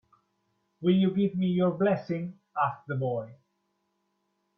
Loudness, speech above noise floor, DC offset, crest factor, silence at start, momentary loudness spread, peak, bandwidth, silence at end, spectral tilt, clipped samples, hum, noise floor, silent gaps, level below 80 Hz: -28 LUFS; 50 dB; under 0.1%; 18 dB; 0.8 s; 11 LU; -12 dBFS; 5.8 kHz; 1.25 s; -10 dB/octave; under 0.1%; none; -77 dBFS; none; -72 dBFS